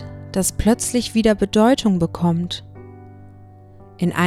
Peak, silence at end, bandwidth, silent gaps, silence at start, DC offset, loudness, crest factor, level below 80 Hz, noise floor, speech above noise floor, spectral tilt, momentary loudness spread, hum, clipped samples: -2 dBFS; 0 s; 16 kHz; none; 0 s; under 0.1%; -19 LUFS; 18 dB; -38 dBFS; -43 dBFS; 26 dB; -5 dB/octave; 10 LU; none; under 0.1%